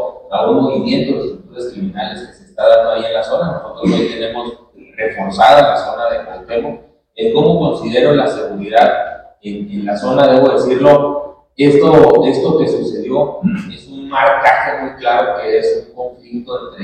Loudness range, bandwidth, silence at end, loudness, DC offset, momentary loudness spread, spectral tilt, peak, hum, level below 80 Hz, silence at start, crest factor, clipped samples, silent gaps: 5 LU; 9.4 kHz; 0 s; -13 LUFS; under 0.1%; 17 LU; -6.5 dB/octave; 0 dBFS; none; -46 dBFS; 0 s; 14 dB; 0.5%; none